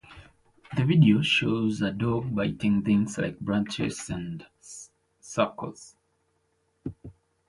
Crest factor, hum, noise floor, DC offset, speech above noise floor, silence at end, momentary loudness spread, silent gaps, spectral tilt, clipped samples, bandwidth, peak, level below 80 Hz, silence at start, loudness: 20 dB; none; -72 dBFS; under 0.1%; 47 dB; 0.35 s; 21 LU; none; -6 dB/octave; under 0.1%; 11.5 kHz; -8 dBFS; -56 dBFS; 0.1 s; -26 LUFS